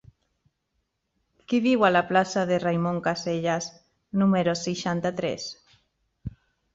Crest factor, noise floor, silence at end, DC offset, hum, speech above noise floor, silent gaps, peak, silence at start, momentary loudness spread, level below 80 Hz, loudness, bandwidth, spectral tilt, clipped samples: 20 dB; -77 dBFS; 0.45 s; under 0.1%; none; 53 dB; none; -6 dBFS; 1.5 s; 17 LU; -58 dBFS; -25 LUFS; 7.8 kHz; -5.5 dB/octave; under 0.1%